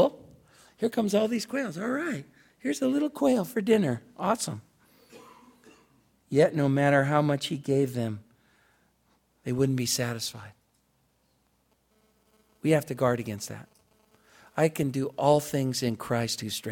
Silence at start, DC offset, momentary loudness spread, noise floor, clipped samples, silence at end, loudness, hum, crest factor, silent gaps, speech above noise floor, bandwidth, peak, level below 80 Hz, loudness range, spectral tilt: 0 s; under 0.1%; 12 LU; -70 dBFS; under 0.1%; 0 s; -27 LUFS; none; 20 dB; none; 43 dB; 17 kHz; -8 dBFS; -66 dBFS; 6 LU; -5.5 dB/octave